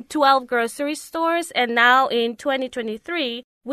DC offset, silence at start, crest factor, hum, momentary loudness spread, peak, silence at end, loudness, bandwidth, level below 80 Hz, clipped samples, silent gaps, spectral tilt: under 0.1%; 0.1 s; 18 dB; none; 12 LU; -2 dBFS; 0 s; -20 LUFS; 13.5 kHz; -66 dBFS; under 0.1%; 3.44-3.61 s; -2 dB/octave